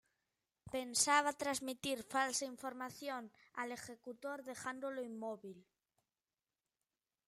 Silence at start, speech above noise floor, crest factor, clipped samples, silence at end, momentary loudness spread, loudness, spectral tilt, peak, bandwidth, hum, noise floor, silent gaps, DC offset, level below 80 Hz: 0.65 s; over 49 dB; 26 dB; under 0.1%; 1.65 s; 16 LU; -40 LUFS; -1.5 dB/octave; -16 dBFS; 16 kHz; none; under -90 dBFS; none; under 0.1%; -80 dBFS